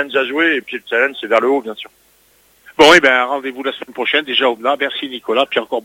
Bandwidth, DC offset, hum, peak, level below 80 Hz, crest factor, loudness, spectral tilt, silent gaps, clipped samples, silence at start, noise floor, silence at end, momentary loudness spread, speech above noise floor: 17 kHz; under 0.1%; none; 0 dBFS; -54 dBFS; 16 dB; -14 LUFS; -2.5 dB/octave; none; under 0.1%; 0 s; -53 dBFS; 0.05 s; 15 LU; 38 dB